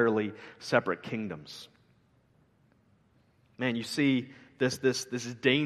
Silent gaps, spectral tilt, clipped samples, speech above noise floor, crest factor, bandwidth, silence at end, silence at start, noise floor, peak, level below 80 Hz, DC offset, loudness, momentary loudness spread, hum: none; -4.5 dB/octave; under 0.1%; 36 dB; 24 dB; 13 kHz; 0 s; 0 s; -66 dBFS; -8 dBFS; -72 dBFS; under 0.1%; -31 LUFS; 17 LU; none